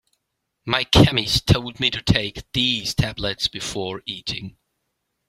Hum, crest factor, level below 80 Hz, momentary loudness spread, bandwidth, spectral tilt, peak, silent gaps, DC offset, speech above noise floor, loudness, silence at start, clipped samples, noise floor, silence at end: none; 22 dB; -38 dBFS; 13 LU; 15.5 kHz; -4.5 dB/octave; 0 dBFS; none; under 0.1%; 56 dB; -21 LUFS; 0.65 s; under 0.1%; -77 dBFS; 0.8 s